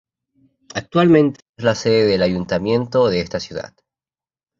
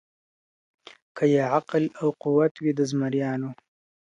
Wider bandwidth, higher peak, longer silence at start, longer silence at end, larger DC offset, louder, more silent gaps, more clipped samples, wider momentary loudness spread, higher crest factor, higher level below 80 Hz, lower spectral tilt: second, 7.6 kHz vs 9.6 kHz; first, -2 dBFS vs -8 dBFS; second, 0.75 s vs 1.15 s; first, 0.95 s vs 0.6 s; neither; first, -17 LUFS vs -25 LUFS; about the same, 1.49-1.53 s vs 2.51-2.55 s; neither; first, 16 LU vs 8 LU; about the same, 18 dB vs 18 dB; first, -48 dBFS vs -74 dBFS; about the same, -6.5 dB/octave vs -7 dB/octave